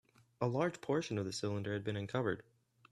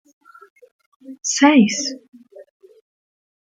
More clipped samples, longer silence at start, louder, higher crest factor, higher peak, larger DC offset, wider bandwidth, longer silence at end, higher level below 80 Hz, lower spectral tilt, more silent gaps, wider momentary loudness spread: neither; second, 0.4 s vs 1.1 s; second, -38 LUFS vs -16 LUFS; about the same, 20 dB vs 20 dB; second, -18 dBFS vs -2 dBFS; neither; first, 12.5 kHz vs 9.4 kHz; second, 0.5 s vs 1.1 s; about the same, -72 dBFS vs -70 dBFS; first, -6 dB/octave vs -3.5 dB/octave; second, none vs 2.08-2.12 s; second, 4 LU vs 14 LU